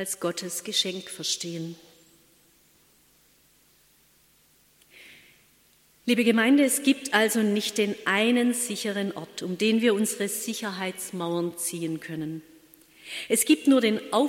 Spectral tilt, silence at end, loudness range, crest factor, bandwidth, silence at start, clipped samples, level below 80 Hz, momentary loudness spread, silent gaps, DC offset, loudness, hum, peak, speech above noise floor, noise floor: -3 dB/octave; 0 s; 10 LU; 22 dB; 17 kHz; 0 s; under 0.1%; -74 dBFS; 14 LU; none; under 0.1%; -25 LUFS; none; -6 dBFS; 36 dB; -62 dBFS